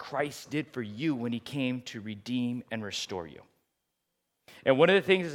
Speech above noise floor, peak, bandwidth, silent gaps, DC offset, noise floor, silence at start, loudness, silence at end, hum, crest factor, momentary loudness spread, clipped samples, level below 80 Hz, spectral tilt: 52 dB; -6 dBFS; 16 kHz; none; under 0.1%; -82 dBFS; 0 s; -30 LUFS; 0 s; none; 24 dB; 16 LU; under 0.1%; -76 dBFS; -5 dB/octave